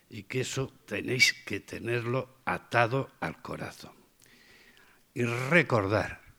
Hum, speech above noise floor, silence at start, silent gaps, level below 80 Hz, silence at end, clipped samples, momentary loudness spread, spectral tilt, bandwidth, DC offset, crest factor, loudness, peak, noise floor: none; 30 dB; 0.1 s; none; -64 dBFS; 0.2 s; under 0.1%; 16 LU; -4.5 dB/octave; over 20 kHz; under 0.1%; 24 dB; -29 LUFS; -6 dBFS; -60 dBFS